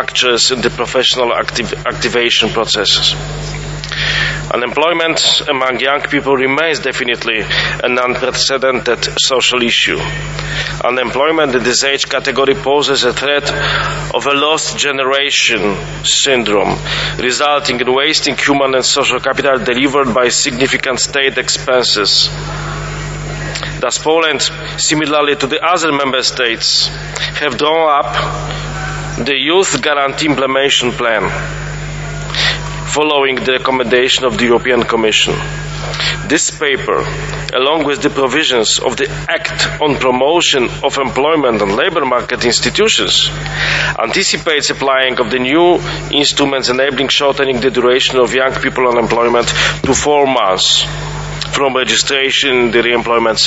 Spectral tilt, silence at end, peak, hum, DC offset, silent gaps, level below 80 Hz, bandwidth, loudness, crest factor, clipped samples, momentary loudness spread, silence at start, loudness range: -2.5 dB/octave; 0 s; 0 dBFS; 50 Hz at -30 dBFS; under 0.1%; none; -34 dBFS; 8.2 kHz; -12 LUFS; 14 dB; under 0.1%; 8 LU; 0 s; 2 LU